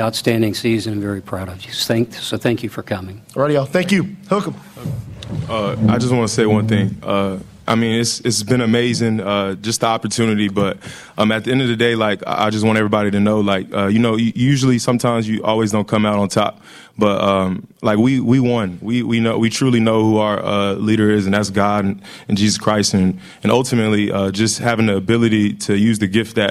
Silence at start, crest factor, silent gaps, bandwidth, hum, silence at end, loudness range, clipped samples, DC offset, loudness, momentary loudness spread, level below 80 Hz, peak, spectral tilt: 0 s; 16 dB; none; 15 kHz; none; 0 s; 4 LU; under 0.1%; under 0.1%; -17 LUFS; 8 LU; -50 dBFS; -2 dBFS; -5.5 dB/octave